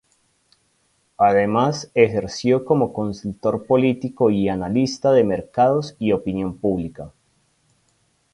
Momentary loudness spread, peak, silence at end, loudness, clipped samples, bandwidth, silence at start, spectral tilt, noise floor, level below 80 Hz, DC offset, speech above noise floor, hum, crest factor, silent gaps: 9 LU; -2 dBFS; 1.25 s; -20 LUFS; under 0.1%; 11 kHz; 1.2 s; -6.5 dB/octave; -65 dBFS; -50 dBFS; under 0.1%; 46 dB; none; 20 dB; none